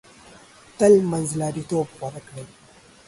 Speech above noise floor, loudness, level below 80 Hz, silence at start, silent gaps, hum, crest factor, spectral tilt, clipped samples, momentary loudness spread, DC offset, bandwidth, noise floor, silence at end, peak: 27 dB; -21 LUFS; -58 dBFS; 0.8 s; none; none; 20 dB; -6.5 dB/octave; under 0.1%; 22 LU; under 0.1%; 11.5 kHz; -49 dBFS; 0.6 s; -4 dBFS